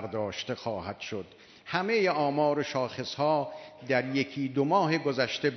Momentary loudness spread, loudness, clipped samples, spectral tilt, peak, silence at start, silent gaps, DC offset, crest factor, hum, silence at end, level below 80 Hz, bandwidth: 12 LU; -29 LUFS; under 0.1%; -5.5 dB/octave; -10 dBFS; 0 s; none; under 0.1%; 18 dB; none; 0 s; -70 dBFS; 6.4 kHz